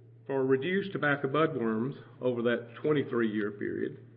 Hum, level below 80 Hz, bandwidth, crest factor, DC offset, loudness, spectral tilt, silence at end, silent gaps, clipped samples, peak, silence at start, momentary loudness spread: none; -76 dBFS; 4.9 kHz; 16 dB; under 0.1%; -31 LUFS; -10.5 dB/octave; 0 s; none; under 0.1%; -14 dBFS; 0.1 s; 7 LU